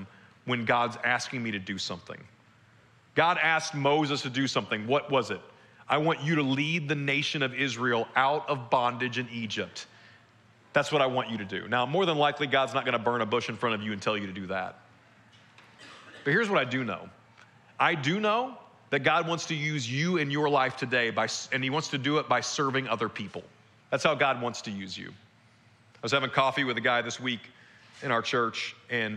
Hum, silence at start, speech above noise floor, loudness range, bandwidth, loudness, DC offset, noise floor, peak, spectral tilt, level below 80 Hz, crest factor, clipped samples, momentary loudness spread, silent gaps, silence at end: none; 0 s; 32 dB; 4 LU; 12 kHz; -28 LUFS; under 0.1%; -60 dBFS; -8 dBFS; -4.5 dB/octave; -76 dBFS; 22 dB; under 0.1%; 11 LU; none; 0 s